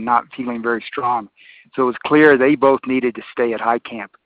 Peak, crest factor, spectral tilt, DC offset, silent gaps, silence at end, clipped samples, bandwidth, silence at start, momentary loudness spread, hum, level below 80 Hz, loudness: 0 dBFS; 18 dB; -4 dB/octave; under 0.1%; none; 0.2 s; under 0.1%; 4.9 kHz; 0 s; 12 LU; none; -62 dBFS; -17 LUFS